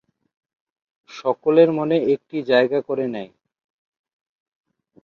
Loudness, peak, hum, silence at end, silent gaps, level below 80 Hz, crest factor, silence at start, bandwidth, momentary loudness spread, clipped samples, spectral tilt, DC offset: -20 LUFS; -2 dBFS; none; 1.75 s; none; -70 dBFS; 20 dB; 1.1 s; 6.8 kHz; 15 LU; under 0.1%; -7 dB/octave; under 0.1%